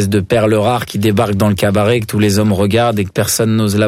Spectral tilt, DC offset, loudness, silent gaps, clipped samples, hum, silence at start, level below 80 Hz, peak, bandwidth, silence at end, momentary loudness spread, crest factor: -5.5 dB/octave; under 0.1%; -13 LUFS; none; under 0.1%; none; 0 s; -42 dBFS; -2 dBFS; 16.5 kHz; 0 s; 3 LU; 12 dB